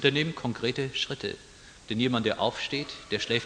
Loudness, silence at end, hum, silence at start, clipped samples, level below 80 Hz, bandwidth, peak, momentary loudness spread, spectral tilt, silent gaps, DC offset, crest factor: -29 LUFS; 0 s; none; 0 s; under 0.1%; -58 dBFS; 10 kHz; -6 dBFS; 10 LU; -4.5 dB/octave; none; under 0.1%; 22 dB